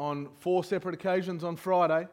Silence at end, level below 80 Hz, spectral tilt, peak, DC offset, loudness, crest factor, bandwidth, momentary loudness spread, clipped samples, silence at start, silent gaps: 0.05 s; -74 dBFS; -7 dB/octave; -14 dBFS; under 0.1%; -30 LUFS; 16 dB; 16.5 kHz; 9 LU; under 0.1%; 0 s; none